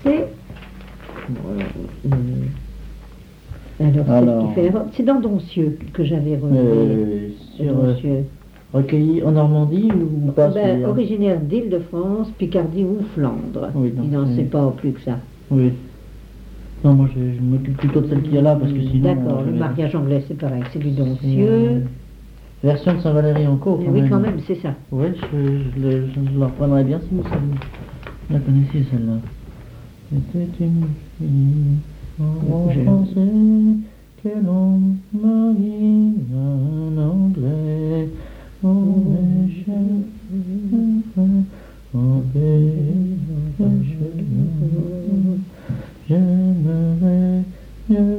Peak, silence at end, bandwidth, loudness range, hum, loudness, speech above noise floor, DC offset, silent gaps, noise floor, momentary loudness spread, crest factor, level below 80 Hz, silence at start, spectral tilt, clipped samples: -2 dBFS; 0 s; 5 kHz; 4 LU; none; -19 LUFS; 23 dB; under 0.1%; none; -40 dBFS; 12 LU; 16 dB; -40 dBFS; 0 s; -10.5 dB/octave; under 0.1%